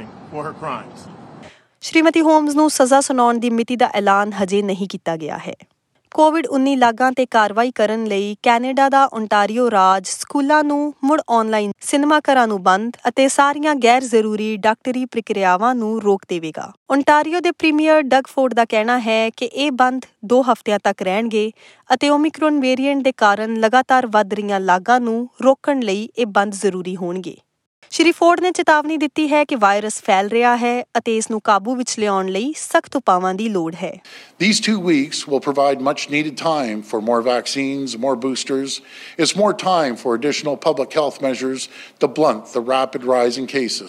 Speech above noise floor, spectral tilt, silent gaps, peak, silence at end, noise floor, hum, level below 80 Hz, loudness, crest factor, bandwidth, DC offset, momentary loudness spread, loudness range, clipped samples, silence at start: 25 dB; -4 dB/octave; 16.77-16.86 s, 27.66-27.82 s; 0 dBFS; 0 s; -42 dBFS; none; -72 dBFS; -17 LUFS; 16 dB; 13 kHz; under 0.1%; 9 LU; 4 LU; under 0.1%; 0 s